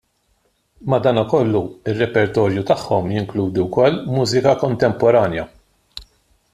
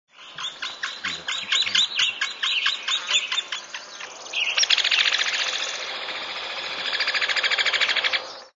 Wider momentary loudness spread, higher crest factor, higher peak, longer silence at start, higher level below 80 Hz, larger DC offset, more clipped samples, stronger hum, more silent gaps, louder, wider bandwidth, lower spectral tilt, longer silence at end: about the same, 15 LU vs 13 LU; second, 16 dB vs 22 dB; about the same, -2 dBFS vs -4 dBFS; first, 0.8 s vs 0.2 s; first, -50 dBFS vs -72 dBFS; neither; neither; neither; neither; first, -18 LUFS vs -22 LUFS; first, 14 kHz vs 8 kHz; first, -6.5 dB/octave vs 2 dB/octave; first, 0.5 s vs 0.1 s